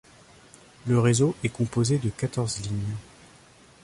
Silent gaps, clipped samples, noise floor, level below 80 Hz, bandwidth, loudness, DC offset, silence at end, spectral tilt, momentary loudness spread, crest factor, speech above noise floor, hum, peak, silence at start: none; under 0.1%; -54 dBFS; -52 dBFS; 11.5 kHz; -26 LUFS; under 0.1%; 0.8 s; -6 dB/octave; 11 LU; 18 dB; 29 dB; none; -10 dBFS; 0.85 s